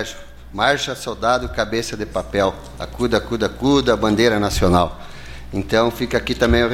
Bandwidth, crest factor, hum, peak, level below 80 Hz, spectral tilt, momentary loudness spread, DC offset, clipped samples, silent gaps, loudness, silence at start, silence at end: 16.5 kHz; 18 dB; none; -2 dBFS; -32 dBFS; -5 dB/octave; 15 LU; under 0.1%; under 0.1%; none; -19 LUFS; 0 s; 0 s